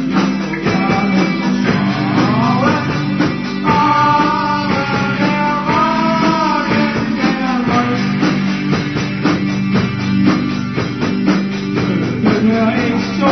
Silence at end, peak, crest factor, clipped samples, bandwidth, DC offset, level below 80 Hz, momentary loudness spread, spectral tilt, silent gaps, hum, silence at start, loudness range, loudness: 0 s; -2 dBFS; 12 dB; under 0.1%; 6.4 kHz; under 0.1%; -42 dBFS; 4 LU; -6.5 dB/octave; none; none; 0 s; 2 LU; -15 LUFS